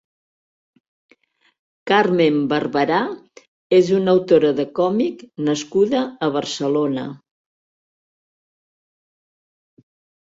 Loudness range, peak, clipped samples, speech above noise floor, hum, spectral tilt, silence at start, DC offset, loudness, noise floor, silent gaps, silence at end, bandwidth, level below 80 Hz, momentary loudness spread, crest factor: 9 LU; -2 dBFS; under 0.1%; 41 dB; none; -5.5 dB/octave; 1.85 s; under 0.1%; -19 LUFS; -59 dBFS; 3.48-3.70 s; 3.1 s; 7.8 kHz; -64 dBFS; 10 LU; 18 dB